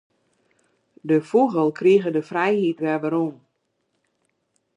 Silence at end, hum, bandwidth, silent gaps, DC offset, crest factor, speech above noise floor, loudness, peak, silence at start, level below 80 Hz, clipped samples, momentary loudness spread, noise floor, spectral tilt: 1.4 s; none; 10 kHz; none; under 0.1%; 16 dB; 53 dB; -21 LUFS; -6 dBFS; 1.05 s; -76 dBFS; under 0.1%; 7 LU; -73 dBFS; -7.5 dB/octave